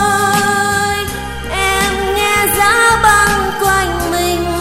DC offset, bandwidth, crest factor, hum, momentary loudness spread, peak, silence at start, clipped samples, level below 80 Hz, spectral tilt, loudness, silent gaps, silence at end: under 0.1%; 17 kHz; 14 dB; none; 7 LU; 0 dBFS; 0 s; under 0.1%; -30 dBFS; -3 dB/octave; -12 LUFS; none; 0 s